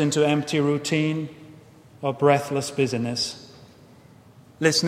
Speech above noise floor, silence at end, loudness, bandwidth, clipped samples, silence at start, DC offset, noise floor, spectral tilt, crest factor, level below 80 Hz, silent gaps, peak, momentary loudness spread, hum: 28 dB; 0 s; -23 LUFS; 16 kHz; under 0.1%; 0 s; under 0.1%; -50 dBFS; -4.5 dB/octave; 20 dB; -64 dBFS; none; -4 dBFS; 11 LU; none